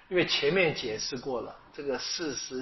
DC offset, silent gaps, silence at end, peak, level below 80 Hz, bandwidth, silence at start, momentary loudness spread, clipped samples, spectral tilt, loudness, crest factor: under 0.1%; none; 0 s; -12 dBFS; -60 dBFS; 6.2 kHz; 0.1 s; 11 LU; under 0.1%; -2.5 dB/octave; -29 LUFS; 18 dB